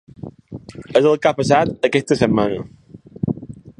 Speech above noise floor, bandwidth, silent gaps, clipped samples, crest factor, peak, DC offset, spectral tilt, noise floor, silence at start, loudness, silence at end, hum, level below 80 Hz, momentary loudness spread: 19 dB; 11 kHz; none; under 0.1%; 20 dB; 0 dBFS; under 0.1%; -6 dB/octave; -36 dBFS; 0.25 s; -18 LUFS; 0.1 s; none; -48 dBFS; 21 LU